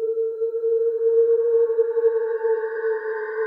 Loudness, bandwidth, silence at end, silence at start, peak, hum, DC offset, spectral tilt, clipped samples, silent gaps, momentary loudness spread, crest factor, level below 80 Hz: -22 LUFS; 2.2 kHz; 0 s; 0 s; -10 dBFS; none; under 0.1%; -5 dB/octave; under 0.1%; none; 7 LU; 12 dB; under -90 dBFS